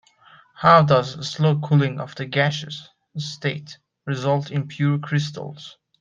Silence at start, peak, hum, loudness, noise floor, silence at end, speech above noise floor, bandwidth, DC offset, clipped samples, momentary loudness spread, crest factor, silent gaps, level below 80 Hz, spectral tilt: 0.6 s; -2 dBFS; none; -21 LUFS; -52 dBFS; 0.3 s; 31 dB; 7.6 kHz; under 0.1%; under 0.1%; 21 LU; 20 dB; none; -60 dBFS; -6.5 dB/octave